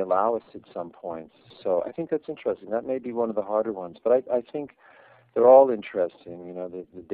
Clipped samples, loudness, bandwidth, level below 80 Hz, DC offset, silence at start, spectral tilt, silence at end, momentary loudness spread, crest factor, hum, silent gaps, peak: under 0.1%; -24 LUFS; 4.4 kHz; -70 dBFS; under 0.1%; 0 s; -10.5 dB/octave; 0 s; 20 LU; 22 dB; none; none; -4 dBFS